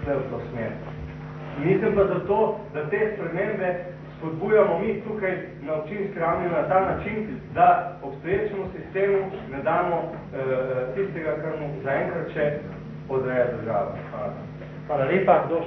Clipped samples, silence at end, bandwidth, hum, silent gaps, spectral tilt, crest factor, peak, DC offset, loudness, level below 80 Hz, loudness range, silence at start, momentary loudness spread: under 0.1%; 0 s; 6 kHz; none; none; -9.5 dB/octave; 20 dB; -6 dBFS; under 0.1%; -25 LUFS; -50 dBFS; 3 LU; 0 s; 13 LU